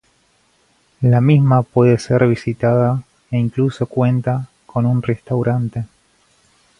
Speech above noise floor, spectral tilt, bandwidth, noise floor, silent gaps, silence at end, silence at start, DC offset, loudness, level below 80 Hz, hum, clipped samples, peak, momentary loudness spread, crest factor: 44 dB; -9 dB/octave; 10 kHz; -59 dBFS; none; 0.95 s; 1 s; under 0.1%; -17 LUFS; -50 dBFS; none; under 0.1%; 0 dBFS; 12 LU; 16 dB